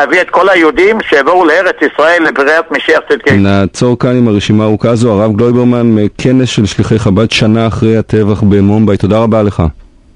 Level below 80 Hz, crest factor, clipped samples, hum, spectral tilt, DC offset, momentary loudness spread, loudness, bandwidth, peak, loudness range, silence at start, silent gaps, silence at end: -30 dBFS; 8 dB; 0.5%; none; -6.5 dB/octave; under 0.1%; 4 LU; -9 LUFS; 11 kHz; 0 dBFS; 1 LU; 0 s; none; 0.35 s